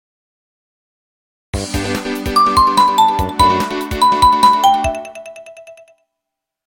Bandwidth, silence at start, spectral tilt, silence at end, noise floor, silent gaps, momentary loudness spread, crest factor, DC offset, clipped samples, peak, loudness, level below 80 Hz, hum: 17.5 kHz; 1.55 s; -4 dB/octave; 0.95 s; -80 dBFS; none; 17 LU; 16 dB; under 0.1%; under 0.1%; 0 dBFS; -13 LUFS; -34 dBFS; none